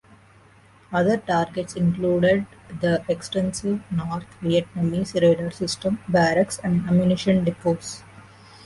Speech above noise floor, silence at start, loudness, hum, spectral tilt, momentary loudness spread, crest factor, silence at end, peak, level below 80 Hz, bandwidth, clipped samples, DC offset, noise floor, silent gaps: 31 dB; 0.9 s; -23 LUFS; none; -6 dB/octave; 8 LU; 16 dB; 0.45 s; -6 dBFS; -52 dBFS; 11.5 kHz; under 0.1%; under 0.1%; -53 dBFS; none